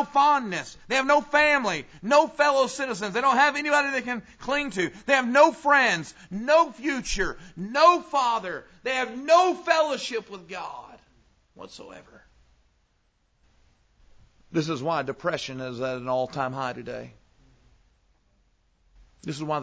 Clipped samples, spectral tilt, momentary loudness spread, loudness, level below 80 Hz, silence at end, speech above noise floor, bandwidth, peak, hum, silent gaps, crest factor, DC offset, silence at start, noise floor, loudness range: under 0.1%; -4 dB/octave; 17 LU; -24 LUFS; -54 dBFS; 0 s; 44 dB; 8 kHz; -6 dBFS; none; none; 20 dB; under 0.1%; 0 s; -69 dBFS; 13 LU